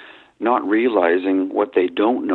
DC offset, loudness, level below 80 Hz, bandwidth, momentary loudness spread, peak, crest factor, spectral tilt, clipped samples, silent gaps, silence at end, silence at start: under 0.1%; -19 LUFS; -68 dBFS; 4.2 kHz; 4 LU; -4 dBFS; 16 dB; -8 dB/octave; under 0.1%; none; 0 s; 0 s